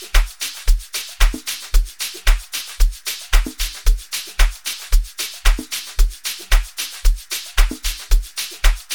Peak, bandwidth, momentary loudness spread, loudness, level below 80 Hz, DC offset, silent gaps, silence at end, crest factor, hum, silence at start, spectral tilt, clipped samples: 0 dBFS; 19 kHz; 5 LU; -22 LUFS; -18 dBFS; 0.5%; none; 0 s; 16 dB; none; 0 s; -2 dB/octave; under 0.1%